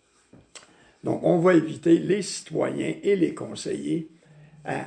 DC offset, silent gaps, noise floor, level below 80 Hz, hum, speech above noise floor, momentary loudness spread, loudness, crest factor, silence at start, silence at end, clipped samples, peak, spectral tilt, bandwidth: under 0.1%; none; -56 dBFS; -66 dBFS; none; 33 dB; 13 LU; -24 LUFS; 18 dB; 0.55 s; 0 s; under 0.1%; -6 dBFS; -6 dB/octave; 10 kHz